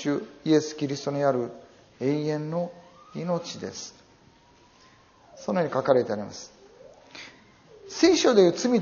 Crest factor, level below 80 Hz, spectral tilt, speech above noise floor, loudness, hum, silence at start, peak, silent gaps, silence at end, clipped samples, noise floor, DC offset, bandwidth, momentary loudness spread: 22 dB; -66 dBFS; -5 dB/octave; 33 dB; -25 LUFS; none; 0 s; -6 dBFS; none; 0 s; under 0.1%; -57 dBFS; under 0.1%; 7.2 kHz; 22 LU